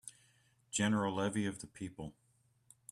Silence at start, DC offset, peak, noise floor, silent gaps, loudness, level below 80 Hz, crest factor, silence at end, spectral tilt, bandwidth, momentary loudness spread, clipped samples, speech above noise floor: 0.05 s; under 0.1%; -22 dBFS; -71 dBFS; none; -37 LUFS; -70 dBFS; 18 dB; 0.8 s; -4.5 dB/octave; 13 kHz; 18 LU; under 0.1%; 35 dB